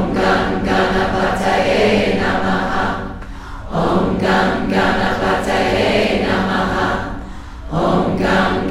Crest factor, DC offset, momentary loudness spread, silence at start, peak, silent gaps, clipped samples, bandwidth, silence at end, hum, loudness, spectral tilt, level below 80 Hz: 14 dB; under 0.1%; 10 LU; 0 s; -2 dBFS; none; under 0.1%; 13.5 kHz; 0 s; none; -16 LUFS; -6 dB/octave; -32 dBFS